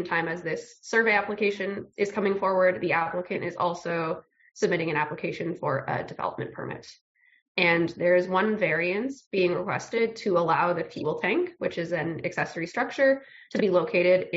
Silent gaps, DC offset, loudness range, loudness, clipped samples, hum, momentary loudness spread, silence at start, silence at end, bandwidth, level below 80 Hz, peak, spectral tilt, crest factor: 7.01-7.15 s, 7.42-7.55 s, 9.27-9.31 s; under 0.1%; 4 LU; -26 LUFS; under 0.1%; none; 10 LU; 0 s; 0 s; 7.6 kHz; -68 dBFS; -6 dBFS; -4 dB/octave; 20 dB